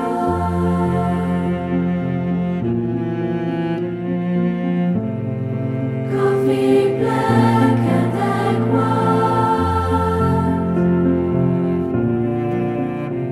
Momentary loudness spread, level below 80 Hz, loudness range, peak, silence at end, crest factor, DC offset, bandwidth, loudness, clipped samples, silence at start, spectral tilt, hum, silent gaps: 7 LU; -40 dBFS; 5 LU; -2 dBFS; 0 s; 16 dB; under 0.1%; 12 kHz; -18 LUFS; under 0.1%; 0 s; -8.5 dB/octave; none; none